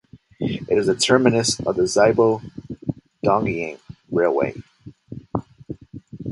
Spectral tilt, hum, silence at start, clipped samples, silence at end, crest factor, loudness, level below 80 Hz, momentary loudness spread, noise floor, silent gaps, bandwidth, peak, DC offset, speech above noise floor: -4.5 dB/octave; none; 0.15 s; under 0.1%; 0 s; 22 dB; -21 LUFS; -50 dBFS; 22 LU; -39 dBFS; none; 11.5 kHz; 0 dBFS; under 0.1%; 20 dB